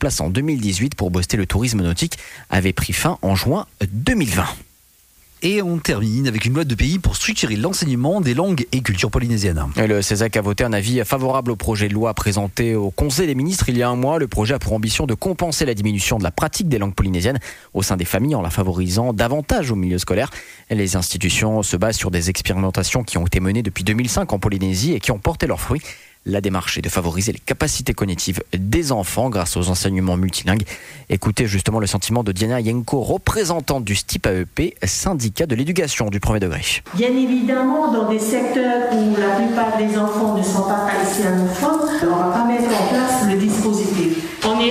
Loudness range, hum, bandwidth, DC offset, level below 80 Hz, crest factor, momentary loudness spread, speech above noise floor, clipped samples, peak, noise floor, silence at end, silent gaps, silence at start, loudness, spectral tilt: 3 LU; none; 16 kHz; under 0.1%; -34 dBFS; 12 dB; 4 LU; 34 dB; under 0.1%; -6 dBFS; -53 dBFS; 0 s; none; 0 s; -19 LUFS; -5 dB/octave